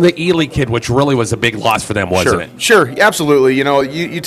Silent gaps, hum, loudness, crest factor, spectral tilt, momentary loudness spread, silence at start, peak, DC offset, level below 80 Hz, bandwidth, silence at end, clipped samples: none; none; -13 LUFS; 12 dB; -4.5 dB/octave; 5 LU; 0 s; 0 dBFS; under 0.1%; -40 dBFS; 16 kHz; 0 s; under 0.1%